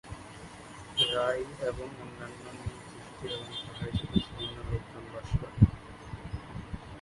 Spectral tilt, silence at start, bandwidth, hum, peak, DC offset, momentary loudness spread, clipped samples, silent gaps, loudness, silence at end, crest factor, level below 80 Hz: -6 dB/octave; 0.05 s; 11.5 kHz; none; -6 dBFS; under 0.1%; 19 LU; under 0.1%; none; -33 LUFS; 0 s; 28 dB; -44 dBFS